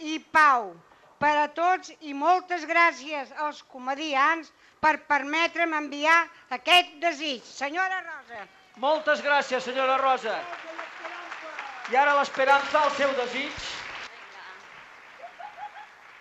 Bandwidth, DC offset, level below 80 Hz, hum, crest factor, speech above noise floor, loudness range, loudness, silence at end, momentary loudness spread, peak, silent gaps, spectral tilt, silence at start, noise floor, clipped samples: 13.5 kHz; under 0.1%; -68 dBFS; none; 20 dB; 23 dB; 3 LU; -24 LUFS; 0.1 s; 20 LU; -8 dBFS; none; -2 dB/octave; 0 s; -48 dBFS; under 0.1%